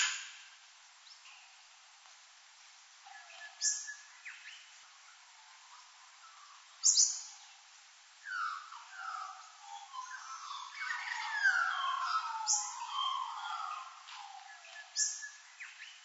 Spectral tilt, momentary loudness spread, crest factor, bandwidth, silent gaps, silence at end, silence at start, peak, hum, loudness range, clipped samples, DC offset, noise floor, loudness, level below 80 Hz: 10 dB/octave; 26 LU; 26 dB; 8.2 kHz; none; 0 s; 0 s; -14 dBFS; none; 10 LU; under 0.1%; under 0.1%; -60 dBFS; -34 LUFS; under -90 dBFS